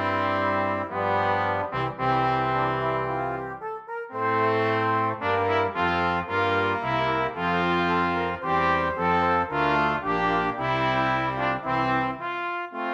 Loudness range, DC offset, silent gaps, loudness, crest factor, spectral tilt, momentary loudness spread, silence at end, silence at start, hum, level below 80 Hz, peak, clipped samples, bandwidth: 2 LU; under 0.1%; none; -25 LUFS; 14 dB; -7 dB/octave; 6 LU; 0 s; 0 s; none; -52 dBFS; -12 dBFS; under 0.1%; 8.8 kHz